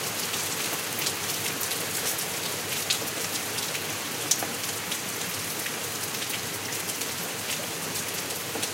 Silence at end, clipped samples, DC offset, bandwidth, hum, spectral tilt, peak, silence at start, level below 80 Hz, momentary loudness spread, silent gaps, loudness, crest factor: 0 s; under 0.1%; under 0.1%; 17 kHz; none; -1 dB/octave; -6 dBFS; 0 s; -68 dBFS; 4 LU; none; -28 LUFS; 24 dB